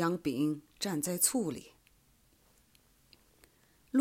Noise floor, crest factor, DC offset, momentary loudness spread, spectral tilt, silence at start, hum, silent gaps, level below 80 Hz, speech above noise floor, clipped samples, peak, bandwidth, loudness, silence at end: -67 dBFS; 24 dB; under 0.1%; 9 LU; -4 dB/octave; 0 s; none; none; -70 dBFS; 34 dB; under 0.1%; -12 dBFS; 16 kHz; -32 LUFS; 0 s